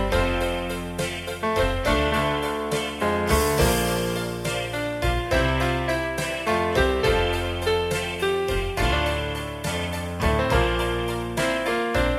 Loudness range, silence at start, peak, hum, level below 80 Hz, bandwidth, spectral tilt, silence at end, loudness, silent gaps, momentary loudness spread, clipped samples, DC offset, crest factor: 1 LU; 0 s; -6 dBFS; none; -32 dBFS; 16 kHz; -4.5 dB/octave; 0 s; -24 LUFS; none; 7 LU; under 0.1%; under 0.1%; 16 dB